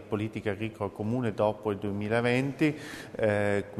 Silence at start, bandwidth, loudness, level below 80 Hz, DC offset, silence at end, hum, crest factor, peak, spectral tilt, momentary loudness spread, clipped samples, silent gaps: 0 s; 13.5 kHz; -30 LUFS; -60 dBFS; under 0.1%; 0 s; none; 18 dB; -12 dBFS; -7 dB/octave; 8 LU; under 0.1%; none